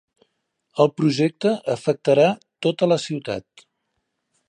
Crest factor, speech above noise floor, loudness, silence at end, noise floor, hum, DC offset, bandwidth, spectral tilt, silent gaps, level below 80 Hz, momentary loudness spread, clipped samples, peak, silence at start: 20 dB; 55 dB; -21 LUFS; 1.1 s; -75 dBFS; none; under 0.1%; 10.5 kHz; -6 dB/octave; none; -66 dBFS; 11 LU; under 0.1%; -2 dBFS; 0.75 s